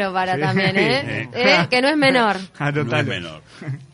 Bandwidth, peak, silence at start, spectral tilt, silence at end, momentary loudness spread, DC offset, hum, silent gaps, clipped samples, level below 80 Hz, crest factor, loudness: 11 kHz; -4 dBFS; 0 s; -5.5 dB/octave; 0.1 s; 15 LU; under 0.1%; none; none; under 0.1%; -56 dBFS; 16 dB; -18 LUFS